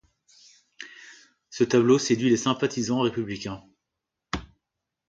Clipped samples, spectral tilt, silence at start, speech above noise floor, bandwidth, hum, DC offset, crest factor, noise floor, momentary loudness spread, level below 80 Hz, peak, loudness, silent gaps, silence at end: under 0.1%; -5 dB/octave; 0.8 s; 61 dB; 9 kHz; none; under 0.1%; 18 dB; -85 dBFS; 22 LU; -54 dBFS; -8 dBFS; -24 LUFS; none; 0.65 s